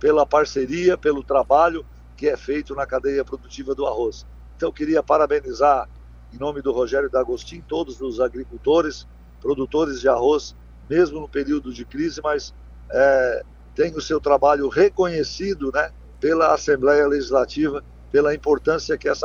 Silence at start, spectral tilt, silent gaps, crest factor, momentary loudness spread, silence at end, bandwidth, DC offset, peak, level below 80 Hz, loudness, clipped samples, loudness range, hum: 0 s; -5 dB/octave; none; 18 dB; 11 LU; 0 s; 7.2 kHz; under 0.1%; -4 dBFS; -42 dBFS; -21 LUFS; under 0.1%; 4 LU; none